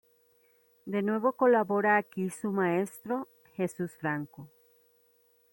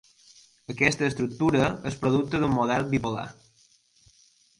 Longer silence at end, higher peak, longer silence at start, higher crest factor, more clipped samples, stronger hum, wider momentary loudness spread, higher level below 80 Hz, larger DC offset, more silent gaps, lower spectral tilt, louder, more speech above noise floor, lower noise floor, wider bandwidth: second, 1.05 s vs 1.25 s; second, -12 dBFS vs -4 dBFS; first, 0.85 s vs 0.7 s; about the same, 18 dB vs 22 dB; neither; neither; about the same, 11 LU vs 12 LU; second, -76 dBFS vs -52 dBFS; neither; neither; about the same, -7 dB/octave vs -6 dB/octave; second, -30 LUFS vs -25 LUFS; about the same, 38 dB vs 37 dB; first, -67 dBFS vs -62 dBFS; first, 16.5 kHz vs 11.5 kHz